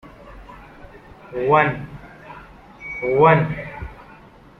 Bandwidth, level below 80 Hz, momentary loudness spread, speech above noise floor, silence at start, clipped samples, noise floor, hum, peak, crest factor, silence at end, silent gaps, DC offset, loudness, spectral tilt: 6.2 kHz; -46 dBFS; 27 LU; 29 dB; 0.05 s; under 0.1%; -46 dBFS; none; -2 dBFS; 20 dB; 0.55 s; none; under 0.1%; -18 LUFS; -8.5 dB/octave